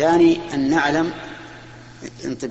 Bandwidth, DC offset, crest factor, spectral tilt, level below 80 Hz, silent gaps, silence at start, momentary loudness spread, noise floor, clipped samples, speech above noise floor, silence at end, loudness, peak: 8.2 kHz; under 0.1%; 16 dB; -5.5 dB/octave; -50 dBFS; none; 0 s; 22 LU; -40 dBFS; under 0.1%; 22 dB; 0 s; -19 LUFS; -6 dBFS